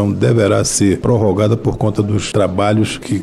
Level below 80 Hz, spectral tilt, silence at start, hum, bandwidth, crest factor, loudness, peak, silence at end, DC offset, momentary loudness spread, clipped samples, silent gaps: -38 dBFS; -5.5 dB/octave; 0 s; none; 13 kHz; 12 dB; -15 LUFS; -2 dBFS; 0 s; under 0.1%; 4 LU; under 0.1%; none